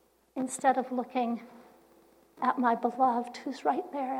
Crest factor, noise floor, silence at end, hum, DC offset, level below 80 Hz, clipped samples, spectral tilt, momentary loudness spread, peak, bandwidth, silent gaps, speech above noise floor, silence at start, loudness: 20 dB; -61 dBFS; 0 s; none; under 0.1%; -80 dBFS; under 0.1%; -4 dB/octave; 10 LU; -12 dBFS; 15.5 kHz; none; 32 dB; 0.35 s; -30 LUFS